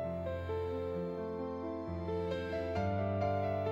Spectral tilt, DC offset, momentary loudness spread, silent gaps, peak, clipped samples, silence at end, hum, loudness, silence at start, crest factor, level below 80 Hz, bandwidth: -8.5 dB/octave; under 0.1%; 6 LU; none; -22 dBFS; under 0.1%; 0 s; none; -37 LUFS; 0 s; 14 dB; -56 dBFS; 7.4 kHz